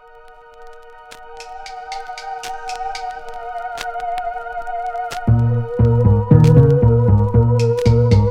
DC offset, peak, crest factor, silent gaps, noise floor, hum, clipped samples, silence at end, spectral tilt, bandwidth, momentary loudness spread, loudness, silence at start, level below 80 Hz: under 0.1%; 0 dBFS; 16 dB; none; -42 dBFS; none; under 0.1%; 0 s; -8 dB/octave; 9.2 kHz; 18 LU; -16 LUFS; 0.6 s; -30 dBFS